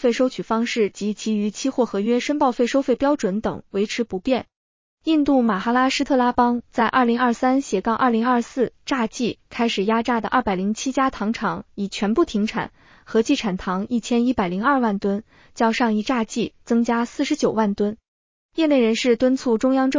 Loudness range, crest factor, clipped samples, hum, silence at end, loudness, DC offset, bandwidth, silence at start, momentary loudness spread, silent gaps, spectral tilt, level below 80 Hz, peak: 3 LU; 14 dB; under 0.1%; none; 0 s; -21 LUFS; under 0.1%; 7.6 kHz; 0 s; 7 LU; 4.56-4.97 s, 18.08-18.49 s; -5 dB/octave; -52 dBFS; -6 dBFS